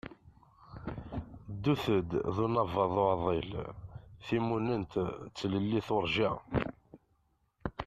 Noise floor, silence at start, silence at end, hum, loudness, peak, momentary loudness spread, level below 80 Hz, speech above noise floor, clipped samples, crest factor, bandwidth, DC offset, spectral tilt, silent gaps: -74 dBFS; 0.05 s; 0 s; none; -33 LUFS; -14 dBFS; 16 LU; -54 dBFS; 42 dB; under 0.1%; 20 dB; 14 kHz; under 0.1%; -7.5 dB/octave; none